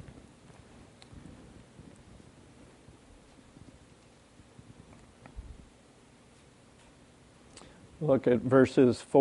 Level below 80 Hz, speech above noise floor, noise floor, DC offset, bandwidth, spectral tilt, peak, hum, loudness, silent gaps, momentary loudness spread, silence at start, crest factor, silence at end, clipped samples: -58 dBFS; 34 dB; -58 dBFS; under 0.1%; 11.5 kHz; -7.5 dB/octave; -10 dBFS; none; -26 LUFS; none; 30 LU; 1.15 s; 22 dB; 0 s; under 0.1%